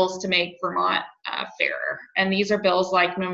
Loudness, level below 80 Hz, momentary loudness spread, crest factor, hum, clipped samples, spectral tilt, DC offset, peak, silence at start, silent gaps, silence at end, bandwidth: -23 LUFS; -64 dBFS; 8 LU; 18 dB; none; under 0.1%; -4 dB/octave; under 0.1%; -6 dBFS; 0 s; none; 0 s; 7.8 kHz